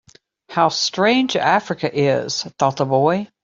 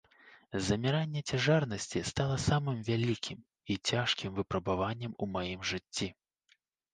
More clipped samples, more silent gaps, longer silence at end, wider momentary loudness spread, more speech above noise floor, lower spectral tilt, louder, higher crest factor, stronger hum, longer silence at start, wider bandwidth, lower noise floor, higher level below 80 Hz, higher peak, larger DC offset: neither; neither; second, 0.2 s vs 0.8 s; second, 5 LU vs 8 LU; second, 28 dB vs 40 dB; about the same, -4.5 dB/octave vs -5 dB/octave; first, -18 LUFS vs -33 LUFS; about the same, 16 dB vs 20 dB; neither; first, 0.5 s vs 0.25 s; second, 7.8 kHz vs 9.8 kHz; second, -46 dBFS vs -73 dBFS; second, -60 dBFS vs -54 dBFS; first, -2 dBFS vs -14 dBFS; neither